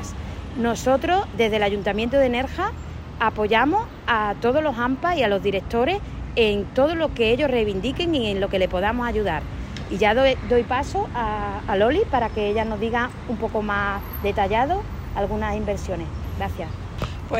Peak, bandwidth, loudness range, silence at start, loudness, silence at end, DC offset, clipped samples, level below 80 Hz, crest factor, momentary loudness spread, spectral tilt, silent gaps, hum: -6 dBFS; 16 kHz; 3 LU; 0 s; -23 LUFS; 0 s; under 0.1%; under 0.1%; -36 dBFS; 16 dB; 10 LU; -6 dB/octave; none; none